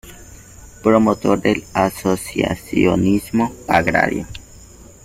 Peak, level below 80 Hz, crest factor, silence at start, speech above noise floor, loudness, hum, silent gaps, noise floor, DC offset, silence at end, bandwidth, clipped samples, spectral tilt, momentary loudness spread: 0 dBFS; -42 dBFS; 18 dB; 0.05 s; 25 dB; -18 LUFS; none; none; -42 dBFS; under 0.1%; 0.65 s; 16 kHz; under 0.1%; -6 dB/octave; 7 LU